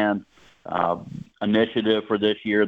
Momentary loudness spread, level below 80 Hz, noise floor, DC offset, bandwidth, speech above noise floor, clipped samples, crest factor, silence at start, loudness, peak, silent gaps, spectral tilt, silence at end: 10 LU; -62 dBFS; -41 dBFS; under 0.1%; 6.6 kHz; 19 dB; under 0.1%; 18 dB; 0 s; -24 LUFS; -6 dBFS; none; -7.5 dB/octave; 0 s